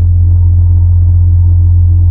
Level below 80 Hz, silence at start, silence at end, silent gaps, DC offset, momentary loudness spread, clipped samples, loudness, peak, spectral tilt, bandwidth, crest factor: -12 dBFS; 0 s; 0 s; none; under 0.1%; 0 LU; under 0.1%; -8 LUFS; 0 dBFS; -15 dB/octave; 1 kHz; 6 dB